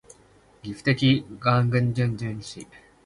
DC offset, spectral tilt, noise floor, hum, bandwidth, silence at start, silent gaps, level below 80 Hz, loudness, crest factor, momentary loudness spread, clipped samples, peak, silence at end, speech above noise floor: under 0.1%; -6.5 dB/octave; -56 dBFS; none; 11 kHz; 0.65 s; none; -54 dBFS; -24 LUFS; 20 dB; 18 LU; under 0.1%; -6 dBFS; 0.4 s; 32 dB